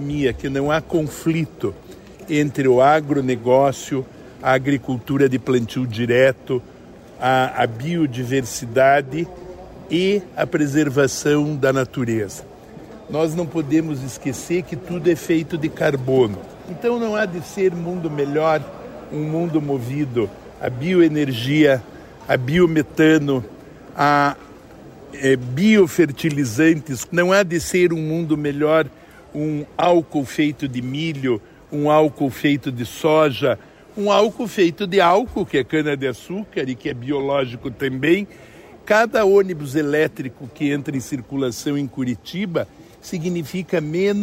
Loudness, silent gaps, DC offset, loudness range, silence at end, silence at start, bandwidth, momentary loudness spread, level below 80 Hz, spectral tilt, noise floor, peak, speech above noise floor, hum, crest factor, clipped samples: -20 LUFS; none; under 0.1%; 4 LU; 0 s; 0 s; 16 kHz; 12 LU; -50 dBFS; -6 dB/octave; -41 dBFS; -4 dBFS; 22 dB; none; 16 dB; under 0.1%